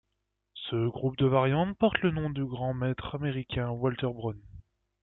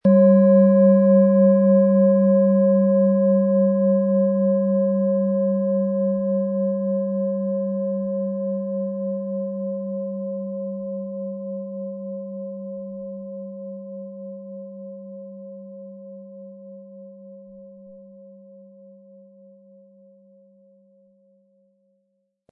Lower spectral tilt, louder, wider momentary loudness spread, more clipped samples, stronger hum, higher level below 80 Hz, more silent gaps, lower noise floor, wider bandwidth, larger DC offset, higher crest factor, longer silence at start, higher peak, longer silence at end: second, -10.5 dB/octave vs -15 dB/octave; second, -30 LUFS vs -20 LUFS; second, 11 LU vs 23 LU; neither; neither; first, -54 dBFS vs -76 dBFS; neither; first, -81 dBFS vs -72 dBFS; first, 4.1 kHz vs 2.5 kHz; neither; first, 22 dB vs 16 dB; first, 0.55 s vs 0.05 s; about the same, -8 dBFS vs -6 dBFS; second, 0.4 s vs 4.25 s